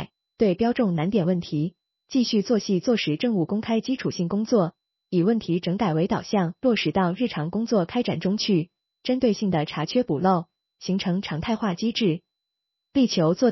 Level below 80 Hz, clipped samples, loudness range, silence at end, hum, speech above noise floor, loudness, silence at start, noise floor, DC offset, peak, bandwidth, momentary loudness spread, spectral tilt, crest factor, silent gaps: -58 dBFS; under 0.1%; 1 LU; 0 s; none; 60 dB; -24 LUFS; 0 s; -83 dBFS; under 0.1%; -8 dBFS; 6.2 kHz; 6 LU; -5.5 dB/octave; 16 dB; none